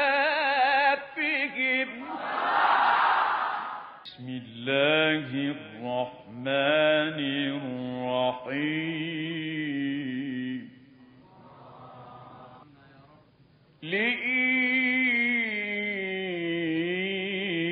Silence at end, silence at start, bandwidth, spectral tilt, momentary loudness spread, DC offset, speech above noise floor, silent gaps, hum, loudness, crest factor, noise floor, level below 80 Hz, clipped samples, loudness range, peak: 0 s; 0 s; 5 kHz; -2 dB/octave; 14 LU; under 0.1%; 29 dB; none; none; -26 LUFS; 18 dB; -59 dBFS; -74 dBFS; under 0.1%; 10 LU; -10 dBFS